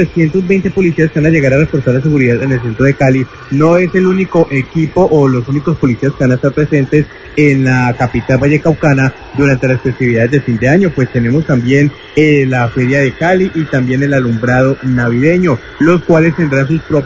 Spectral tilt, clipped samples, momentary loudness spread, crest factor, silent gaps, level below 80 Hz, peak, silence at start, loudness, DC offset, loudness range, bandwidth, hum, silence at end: -8 dB/octave; 0.1%; 4 LU; 10 dB; none; -36 dBFS; 0 dBFS; 0 s; -11 LUFS; 0.1%; 1 LU; 7.8 kHz; none; 0 s